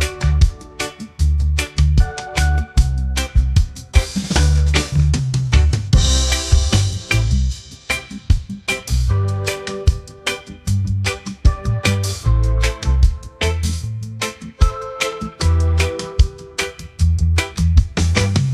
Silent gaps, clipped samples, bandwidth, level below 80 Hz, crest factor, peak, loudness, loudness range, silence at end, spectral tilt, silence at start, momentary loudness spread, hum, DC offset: none; under 0.1%; 13.5 kHz; -20 dBFS; 16 dB; 0 dBFS; -19 LUFS; 4 LU; 0 s; -4.5 dB/octave; 0 s; 8 LU; none; under 0.1%